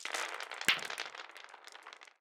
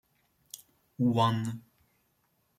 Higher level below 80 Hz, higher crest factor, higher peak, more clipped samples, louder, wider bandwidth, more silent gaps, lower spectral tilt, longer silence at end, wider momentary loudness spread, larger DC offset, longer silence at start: second, -80 dBFS vs -70 dBFS; first, 28 dB vs 20 dB; about the same, -12 dBFS vs -14 dBFS; neither; second, -35 LUFS vs -29 LUFS; first, over 20 kHz vs 16 kHz; neither; second, 0.5 dB/octave vs -6.5 dB/octave; second, 0.15 s vs 1 s; about the same, 20 LU vs 22 LU; neither; second, 0 s vs 1 s